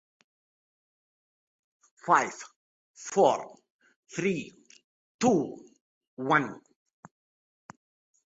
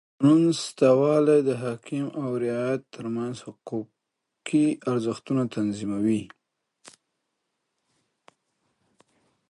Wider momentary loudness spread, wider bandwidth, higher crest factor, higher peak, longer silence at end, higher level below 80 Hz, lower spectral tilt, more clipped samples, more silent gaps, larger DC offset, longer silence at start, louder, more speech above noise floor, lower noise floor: first, 22 LU vs 15 LU; second, 8 kHz vs 11.5 kHz; about the same, 24 dB vs 20 dB; about the same, -8 dBFS vs -6 dBFS; second, 1.8 s vs 3.25 s; about the same, -74 dBFS vs -70 dBFS; second, -5 dB/octave vs -6.5 dB/octave; neither; first, 2.56-2.94 s, 3.70-3.79 s, 3.96-4.03 s, 4.84-5.19 s, 5.81-6.01 s, 6.08-6.17 s vs none; neither; first, 2.05 s vs 0.2 s; second, -28 LUFS vs -25 LUFS; first, over 63 dB vs 58 dB; first, under -90 dBFS vs -82 dBFS